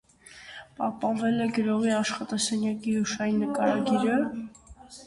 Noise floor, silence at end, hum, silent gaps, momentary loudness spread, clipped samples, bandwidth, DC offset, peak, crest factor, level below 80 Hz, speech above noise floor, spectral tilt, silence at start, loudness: -49 dBFS; 0 s; none; none; 19 LU; under 0.1%; 11.5 kHz; under 0.1%; -12 dBFS; 16 dB; -62 dBFS; 23 dB; -4.5 dB/octave; 0.3 s; -27 LUFS